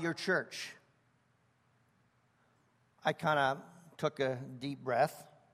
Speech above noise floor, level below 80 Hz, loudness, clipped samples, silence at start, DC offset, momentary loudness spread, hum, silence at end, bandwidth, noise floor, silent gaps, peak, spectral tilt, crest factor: 38 dB; -80 dBFS; -35 LUFS; under 0.1%; 0 s; under 0.1%; 12 LU; none; 0.3 s; 15.5 kHz; -73 dBFS; none; -16 dBFS; -5 dB/octave; 22 dB